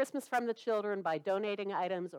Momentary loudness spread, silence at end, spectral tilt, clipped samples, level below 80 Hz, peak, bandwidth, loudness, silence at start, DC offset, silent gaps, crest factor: 2 LU; 0 s; -5 dB/octave; under 0.1%; under -90 dBFS; -20 dBFS; 17.5 kHz; -35 LUFS; 0 s; under 0.1%; none; 14 dB